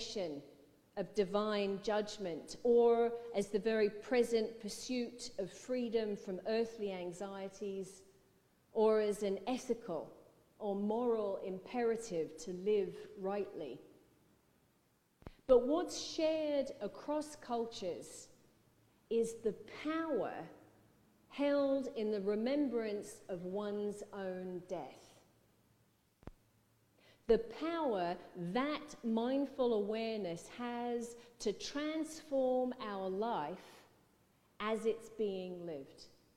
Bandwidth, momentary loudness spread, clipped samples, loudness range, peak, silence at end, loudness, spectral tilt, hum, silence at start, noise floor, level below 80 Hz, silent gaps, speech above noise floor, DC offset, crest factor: 14 kHz; 11 LU; under 0.1%; 7 LU; -16 dBFS; 0.3 s; -38 LUFS; -5 dB/octave; none; 0 s; -75 dBFS; -68 dBFS; none; 37 dB; under 0.1%; 22 dB